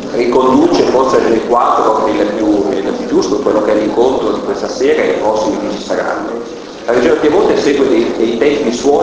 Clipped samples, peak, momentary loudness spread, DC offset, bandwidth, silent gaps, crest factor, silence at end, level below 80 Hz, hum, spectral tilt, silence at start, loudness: under 0.1%; 0 dBFS; 7 LU; under 0.1%; 8 kHz; none; 12 dB; 0 s; -42 dBFS; none; -5 dB/octave; 0 s; -12 LUFS